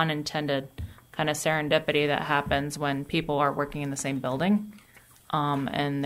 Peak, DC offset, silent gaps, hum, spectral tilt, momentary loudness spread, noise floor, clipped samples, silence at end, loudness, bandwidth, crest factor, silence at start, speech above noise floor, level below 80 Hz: -10 dBFS; under 0.1%; none; none; -5 dB/octave; 7 LU; -55 dBFS; under 0.1%; 0 s; -27 LUFS; 16 kHz; 18 dB; 0 s; 28 dB; -52 dBFS